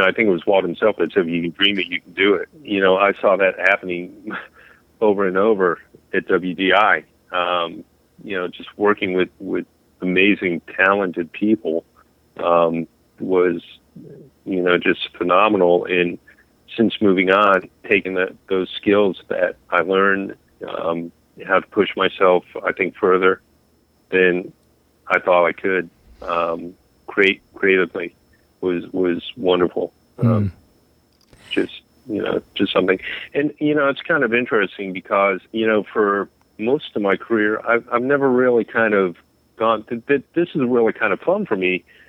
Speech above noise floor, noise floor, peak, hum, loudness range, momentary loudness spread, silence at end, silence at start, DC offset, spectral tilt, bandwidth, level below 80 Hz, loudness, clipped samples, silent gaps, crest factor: 40 dB; -59 dBFS; -2 dBFS; none; 4 LU; 12 LU; 0.3 s; 0 s; under 0.1%; -7.5 dB/octave; 6 kHz; -60 dBFS; -19 LUFS; under 0.1%; none; 18 dB